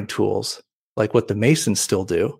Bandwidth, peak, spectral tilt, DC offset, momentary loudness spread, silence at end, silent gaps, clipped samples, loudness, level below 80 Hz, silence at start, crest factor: 16 kHz; -4 dBFS; -4.5 dB/octave; under 0.1%; 12 LU; 0.05 s; 0.73-0.96 s; under 0.1%; -20 LUFS; -56 dBFS; 0 s; 18 dB